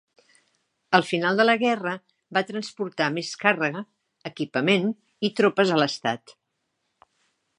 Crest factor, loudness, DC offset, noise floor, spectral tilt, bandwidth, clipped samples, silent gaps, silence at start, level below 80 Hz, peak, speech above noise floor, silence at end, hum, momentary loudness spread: 24 dB; -24 LUFS; under 0.1%; -77 dBFS; -5 dB/octave; 11 kHz; under 0.1%; none; 0.9 s; -78 dBFS; -2 dBFS; 53 dB; 1.25 s; none; 14 LU